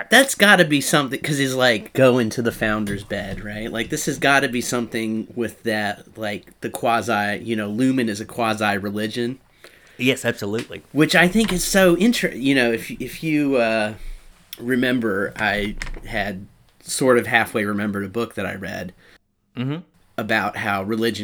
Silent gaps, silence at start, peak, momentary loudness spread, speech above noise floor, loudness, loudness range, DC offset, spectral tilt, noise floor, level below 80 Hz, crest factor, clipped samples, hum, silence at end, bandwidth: none; 0 s; 0 dBFS; 14 LU; 35 dB; -20 LUFS; 6 LU; under 0.1%; -4 dB/octave; -55 dBFS; -44 dBFS; 20 dB; under 0.1%; none; 0 s; over 20 kHz